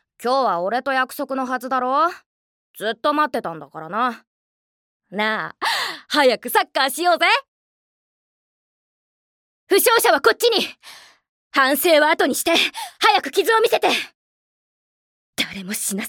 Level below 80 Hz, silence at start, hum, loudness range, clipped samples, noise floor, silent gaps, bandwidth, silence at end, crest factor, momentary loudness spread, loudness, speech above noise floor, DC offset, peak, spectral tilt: -70 dBFS; 0.2 s; none; 6 LU; under 0.1%; under -90 dBFS; 2.26-2.74 s, 4.27-5.00 s, 7.48-9.67 s, 11.29-11.51 s, 14.15-15.33 s; 18 kHz; 0 s; 20 dB; 10 LU; -19 LUFS; over 71 dB; under 0.1%; -2 dBFS; -2 dB/octave